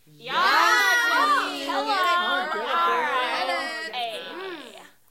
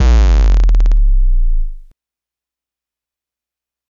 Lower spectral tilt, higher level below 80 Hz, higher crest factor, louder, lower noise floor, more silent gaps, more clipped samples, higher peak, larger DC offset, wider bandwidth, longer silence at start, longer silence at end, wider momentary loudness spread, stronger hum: second, -0.5 dB/octave vs -6.5 dB/octave; second, -74 dBFS vs -12 dBFS; about the same, 16 dB vs 12 dB; second, -22 LUFS vs -15 LUFS; second, -45 dBFS vs -88 dBFS; neither; neither; second, -8 dBFS vs 0 dBFS; neither; first, 16.5 kHz vs 7.2 kHz; first, 0.2 s vs 0 s; second, 0.3 s vs 2.2 s; first, 15 LU vs 11 LU; neither